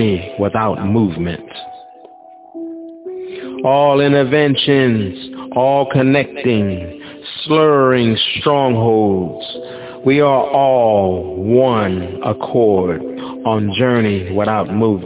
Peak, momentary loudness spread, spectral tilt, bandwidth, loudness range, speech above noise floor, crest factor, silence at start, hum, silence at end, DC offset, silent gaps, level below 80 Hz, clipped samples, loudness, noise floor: 0 dBFS; 17 LU; -10.5 dB/octave; 4 kHz; 4 LU; 26 dB; 14 dB; 0 s; none; 0 s; under 0.1%; none; -42 dBFS; under 0.1%; -15 LUFS; -40 dBFS